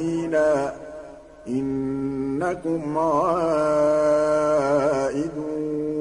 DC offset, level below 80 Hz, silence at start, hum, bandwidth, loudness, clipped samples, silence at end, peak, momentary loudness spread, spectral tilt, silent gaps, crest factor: under 0.1%; -52 dBFS; 0 s; none; 10.5 kHz; -23 LUFS; under 0.1%; 0 s; -10 dBFS; 10 LU; -6.5 dB/octave; none; 12 dB